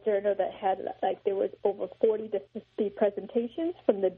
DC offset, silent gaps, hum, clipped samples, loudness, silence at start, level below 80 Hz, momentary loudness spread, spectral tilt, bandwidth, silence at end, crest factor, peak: under 0.1%; none; none; under 0.1%; -30 LUFS; 0.05 s; -70 dBFS; 6 LU; -5 dB/octave; 4.2 kHz; 0 s; 20 dB; -10 dBFS